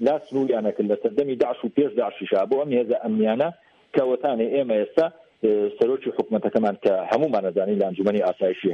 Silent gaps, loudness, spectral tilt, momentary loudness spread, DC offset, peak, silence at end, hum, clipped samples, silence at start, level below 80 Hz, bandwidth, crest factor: none; -23 LUFS; -8 dB/octave; 3 LU; under 0.1%; -6 dBFS; 0 s; none; under 0.1%; 0 s; -70 dBFS; 6.6 kHz; 18 dB